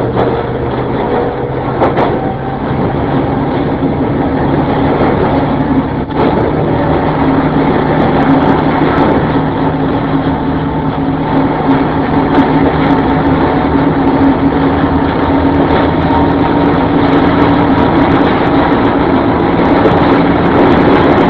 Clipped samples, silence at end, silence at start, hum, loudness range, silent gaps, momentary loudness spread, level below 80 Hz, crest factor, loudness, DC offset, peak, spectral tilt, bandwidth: 0.2%; 0 s; 0 s; none; 4 LU; none; 5 LU; -26 dBFS; 10 dB; -11 LUFS; 0.3%; 0 dBFS; -10 dB/octave; 5.2 kHz